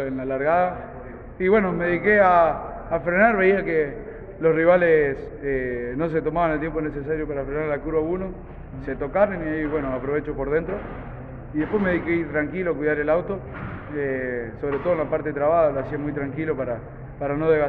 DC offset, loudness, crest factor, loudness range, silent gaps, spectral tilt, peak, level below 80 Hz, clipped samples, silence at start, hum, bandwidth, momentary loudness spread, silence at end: under 0.1%; -23 LUFS; 16 dB; 6 LU; none; -10 dB/octave; -6 dBFS; -42 dBFS; under 0.1%; 0 s; none; 4.6 kHz; 15 LU; 0 s